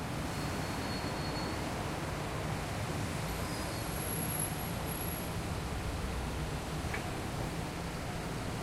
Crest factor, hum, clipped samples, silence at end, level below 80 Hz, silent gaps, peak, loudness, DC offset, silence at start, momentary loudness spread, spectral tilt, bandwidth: 14 dB; none; under 0.1%; 0 s; -46 dBFS; none; -22 dBFS; -37 LUFS; under 0.1%; 0 s; 3 LU; -4.5 dB/octave; 16 kHz